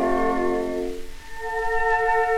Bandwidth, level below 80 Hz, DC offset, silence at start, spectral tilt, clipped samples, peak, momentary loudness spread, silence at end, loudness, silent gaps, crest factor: 15 kHz; -38 dBFS; under 0.1%; 0 s; -5 dB/octave; under 0.1%; -10 dBFS; 14 LU; 0 s; -24 LUFS; none; 14 dB